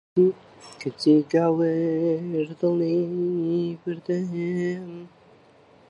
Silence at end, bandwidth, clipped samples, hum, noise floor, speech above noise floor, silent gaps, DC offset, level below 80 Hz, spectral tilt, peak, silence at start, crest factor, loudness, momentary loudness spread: 0.85 s; 11 kHz; under 0.1%; none; -54 dBFS; 31 dB; none; under 0.1%; -72 dBFS; -8 dB/octave; -8 dBFS; 0.15 s; 16 dB; -24 LUFS; 14 LU